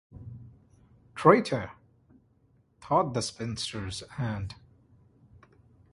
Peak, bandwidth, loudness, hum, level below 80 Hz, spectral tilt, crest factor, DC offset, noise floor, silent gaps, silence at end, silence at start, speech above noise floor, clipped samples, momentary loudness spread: -4 dBFS; 11.5 kHz; -28 LUFS; none; -56 dBFS; -5.5 dB/octave; 28 dB; under 0.1%; -66 dBFS; none; 1.4 s; 0.15 s; 39 dB; under 0.1%; 25 LU